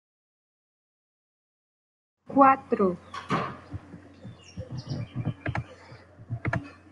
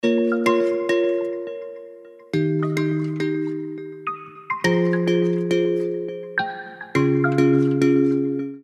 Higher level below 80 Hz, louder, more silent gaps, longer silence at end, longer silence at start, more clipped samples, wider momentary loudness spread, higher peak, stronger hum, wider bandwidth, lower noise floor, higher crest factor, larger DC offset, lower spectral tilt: first, -58 dBFS vs -66 dBFS; second, -27 LUFS vs -22 LUFS; neither; first, 0.2 s vs 0.05 s; first, 2.3 s vs 0.05 s; neither; first, 25 LU vs 13 LU; about the same, -4 dBFS vs -4 dBFS; neither; about the same, 11 kHz vs 12 kHz; first, -49 dBFS vs -42 dBFS; first, 26 dB vs 18 dB; neither; about the same, -7.5 dB/octave vs -7 dB/octave